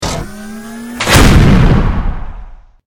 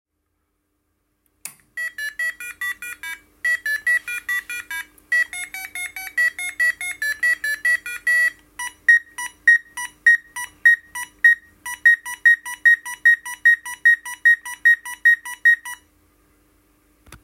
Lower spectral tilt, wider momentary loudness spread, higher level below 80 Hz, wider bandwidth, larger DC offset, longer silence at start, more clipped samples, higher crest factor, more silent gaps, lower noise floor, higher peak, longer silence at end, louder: first, -5 dB/octave vs 2 dB/octave; first, 21 LU vs 16 LU; first, -16 dBFS vs -62 dBFS; first, 18.5 kHz vs 16.5 kHz; neither; second, 0 s vs 1.45 s; first, 0.9% vs under 0.1%; second, 10 dB vs 18 dB; neither; second, -31 dBFS vs -73 dBFS; first, 0 dBFS vs -4 dBFS; first, 0.35 s vs 0.1 s; first, -10 LUFS vs -18 LUFS